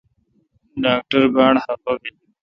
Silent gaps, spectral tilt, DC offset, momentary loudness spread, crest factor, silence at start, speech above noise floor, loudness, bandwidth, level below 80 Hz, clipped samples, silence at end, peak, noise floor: none; -7 dB/octave; under 0.1%; 15 LU; 18 dB; 0.75 s; 46 dB; -18 LUFS; 5.8 kHz; -54 dBFS; under 0.1%; 0.35 s; -2 dBFS; -63 dBFS